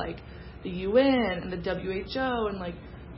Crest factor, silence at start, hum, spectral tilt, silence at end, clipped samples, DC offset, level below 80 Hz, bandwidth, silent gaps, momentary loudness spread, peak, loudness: 18 dB; 0 s; none; -10 dB/octave; 0 s; under 0.1%; under 0.1%; -46 dBFS; 5.8 kHz; none; 18 LU; -12 dBFS; -28 LUFS